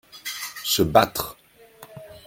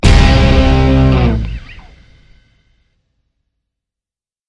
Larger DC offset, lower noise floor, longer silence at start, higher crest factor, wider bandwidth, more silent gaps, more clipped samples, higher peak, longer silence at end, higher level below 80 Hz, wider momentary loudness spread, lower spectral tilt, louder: neither; second, -49 dBFS vs -90 dBFS; about the same, 0.15 s vs 0.05 s; first, 24 dB vs 12 dB; first, 17 kHz vs 11 kHz; neither; neither; about the same, -2 dBFS vs 0 dBFS; second, 0.05 s vs 2.7 s; second, -50 dBFS vs -16 dBFS; first, 21 LU vs 14 LU; second, -3.5 dB/octave vs -6.5 dB/octave; second, -22 LUFS vs -11 LUFS